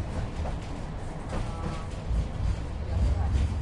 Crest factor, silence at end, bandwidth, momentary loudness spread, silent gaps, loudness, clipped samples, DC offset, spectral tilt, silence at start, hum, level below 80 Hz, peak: 16 dB; 0 s; 11 kHz; 9 LU; none; -32 LUFS; under 0.1%; under 0.1%; -7 dB/octave; 0 s; none; -32 dBFS; -14 dBFS